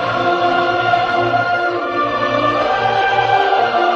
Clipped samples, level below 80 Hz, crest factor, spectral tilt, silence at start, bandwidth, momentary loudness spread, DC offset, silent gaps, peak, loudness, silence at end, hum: under 0.1%; -48 dBFS; 12 dB; -5.5 dB/octave; 0 s; 7.8 kHz; 3 LU; under 0.1%; none; -2 dBFS; -15 LUFS; 0 s; none